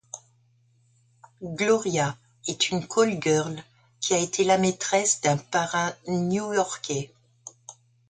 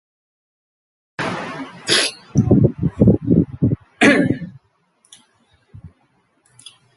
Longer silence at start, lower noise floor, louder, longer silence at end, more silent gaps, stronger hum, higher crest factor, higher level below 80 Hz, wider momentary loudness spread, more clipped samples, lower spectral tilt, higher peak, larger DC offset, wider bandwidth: second, 0.15 s vs 1.2 s; about the same, -63 dBFS vs -62 dBFS; second, -25 LUFS vs -17 LUFS; second, 0.35 s vs 1.1 s; neither; neither; about the same, 18 dB vs 20 dB; second, -64 dBFS vs -38 dBFS; first, 19 LU vs 14 LU; neither; second, -3.5 dB/octave vs -5.5 dB/octave; second, -8 dBFS vs 0 dBFS; neither; second, 9.6 kHz vs 11.5 kHz